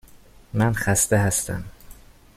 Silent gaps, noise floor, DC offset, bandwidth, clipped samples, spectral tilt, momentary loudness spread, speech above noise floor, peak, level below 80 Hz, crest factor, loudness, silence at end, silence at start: none; -48 dBFS; under 0.1%; 16 kHz; under 0.1%; -4.5 dB/octave; 13 LU; 27 dB; -4 dBFS; -44 dBFS; 20 dB; -22 LUFS; 0.45 s; 0.15 s